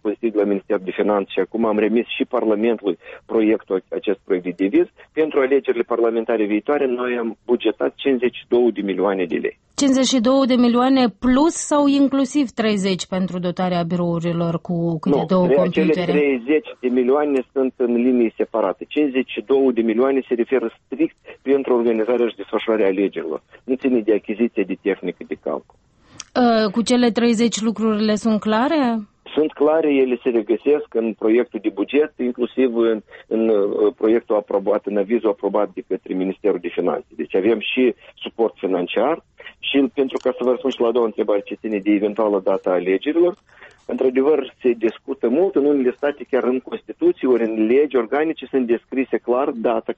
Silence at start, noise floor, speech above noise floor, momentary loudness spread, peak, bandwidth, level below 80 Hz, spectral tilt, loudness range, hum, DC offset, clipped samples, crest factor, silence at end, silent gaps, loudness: 0.05 s; -40 dBFS; 21 dB; 7 LU; -6 dBFS; 8.4 kHz; -58 dBFS; -5.5 dB/octave; 3 LU; none; under 0.1%; under 0.1%; 14 dB; 0.05 s; none; -19 LUFS